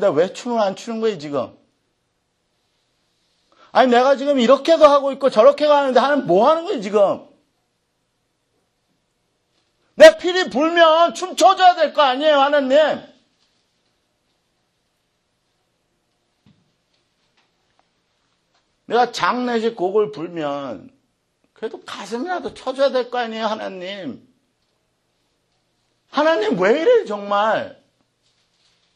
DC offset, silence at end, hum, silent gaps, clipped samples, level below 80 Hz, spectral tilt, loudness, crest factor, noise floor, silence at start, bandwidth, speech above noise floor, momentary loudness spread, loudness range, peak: under 0.1%; 1.25 s; none; none; under 0.1%; -64 dBFS; -4 dB/octave; -17 LUFS; 20 dB; -70 dBFS; 0 s; 12 kHz; 53 dB; 17 LU; 11 LU; 0 dBFS